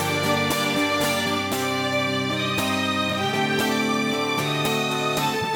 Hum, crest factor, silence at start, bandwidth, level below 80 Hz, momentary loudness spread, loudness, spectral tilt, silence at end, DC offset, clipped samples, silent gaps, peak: none; 14 dB; 0 s; 19.5 kHz; -58 dBFS; 2 LU; -22 LUFS; -4 dB/octave; 0 s; under 0.1%; under 0.1%; none; -10 dBFS